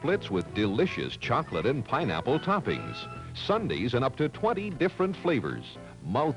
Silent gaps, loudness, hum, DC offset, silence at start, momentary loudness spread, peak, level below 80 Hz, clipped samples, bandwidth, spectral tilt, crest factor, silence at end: none; -29 LUFS; none; under 0.1%; 0 s; 9 LU; -14 dBFS; -54 dBFS; under 0.1%; 11 kHz; -7 dB/octave; 16 dB; 0 s